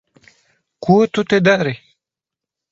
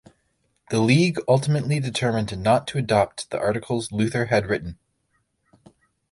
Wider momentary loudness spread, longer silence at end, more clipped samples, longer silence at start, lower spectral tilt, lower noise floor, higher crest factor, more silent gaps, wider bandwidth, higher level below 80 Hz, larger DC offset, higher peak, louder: first, 12 LU vs 8 LU; second, 0.95 s vs 1.4 s; neither; about the same, 0.8 s vs 0.7 s; about the same, -6.5 dB/octave vs -6 dB/octave; first, -86 dBFS vs -71 dBFS; about the same, 18 dB vs 20 dB; neither; second, 7.8 kHz vs 11.5 kHz; second, -58 dBFS vs -52 dBFS; neither; first, 0 dBFS vs -4 dBFS; first, -16 LUFS vs -22 LUFS